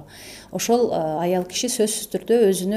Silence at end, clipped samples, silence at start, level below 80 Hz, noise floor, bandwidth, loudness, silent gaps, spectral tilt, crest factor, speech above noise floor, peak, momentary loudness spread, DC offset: 0 s; under 0.1%; 0 s; -58 dBFS; -42 dBFS; 16 kHz; -21 LUFS; none; -4 dB/octave; 14 dB; 21 dB; -6 dBFS; 13 LU; under 0.1%